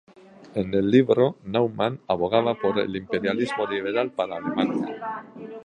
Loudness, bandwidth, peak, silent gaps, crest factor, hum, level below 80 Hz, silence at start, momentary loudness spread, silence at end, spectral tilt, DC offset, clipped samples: -24 LUFS; 9.6 kHz; -6 dBFS; none; 18 dB; none; -58 dBFS; 0.4 s; 11 LU; 0 s; -7.5 dB/octave; under 0.1%; under 0.1%